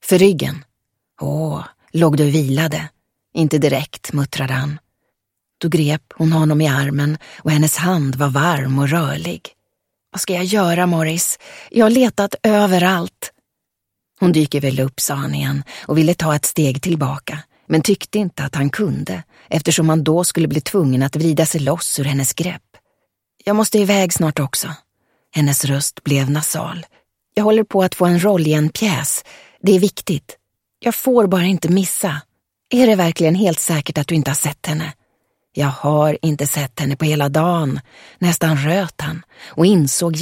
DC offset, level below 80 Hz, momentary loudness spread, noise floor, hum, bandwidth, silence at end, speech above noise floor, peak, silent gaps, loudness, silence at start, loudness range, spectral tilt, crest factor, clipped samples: under 0.1%; -54 dBFS; 11 LU; -79 dBFS; none; 16.5 kHz; 0 s; 62 dB; 0 dBFS; none; -17 LUFS; 0.05 s; 3 LU; -5 dB/octave; 18 dB; under 0.1%